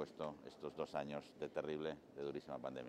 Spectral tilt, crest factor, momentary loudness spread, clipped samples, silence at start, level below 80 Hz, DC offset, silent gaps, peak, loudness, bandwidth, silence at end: -6 dB/octave; 18 dB; 5 LU; under 0.1%; 0 s; -78 dBFS; under 0.1%; none; -28 dBFS; -47 LUFS; 14 kHz; 0 s